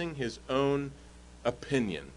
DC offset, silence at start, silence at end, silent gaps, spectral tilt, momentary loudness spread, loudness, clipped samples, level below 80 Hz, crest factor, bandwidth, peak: under 0.1%; 0 s; 0 s; none; -6 dB/octave; 10 LU; -32 LUFS; under 0.1%; -54 dBFS; 18 dB; 11 kHz; -14 dBFS